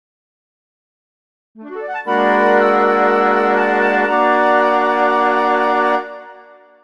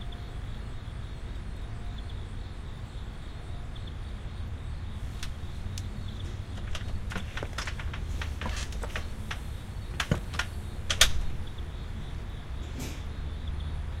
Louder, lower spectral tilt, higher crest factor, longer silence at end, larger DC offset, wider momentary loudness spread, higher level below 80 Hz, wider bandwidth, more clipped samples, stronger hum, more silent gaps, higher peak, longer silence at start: first, -14 LUFS vs -35 LUFS; first, -5.5 dB/octave vs -3.5 dB/octave; second, 14 dB vs 30 dB; first, 0.45 s vs 0 s; first, 0.4% vs under 0.1%; first, 12 LU vs 9 LU; second, -74 dBFS vs -38 dBFS; second, 10.5 kHz vs 16 kHz; neither; neither; neither; about the same, -2 dBFS vs -4 dBFS; first, 1.55 s vs 0 s